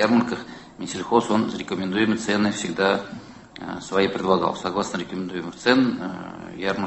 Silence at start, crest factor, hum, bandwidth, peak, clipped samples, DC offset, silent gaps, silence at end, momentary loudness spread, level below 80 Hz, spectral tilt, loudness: 0 s; 20 dB; none; 8.6 kHz; -4 dBFS; under 0.1%; under 0.1%; none; 0 s; 15 LU; -56 dBFS; -5 dB/octave; -23 LUFS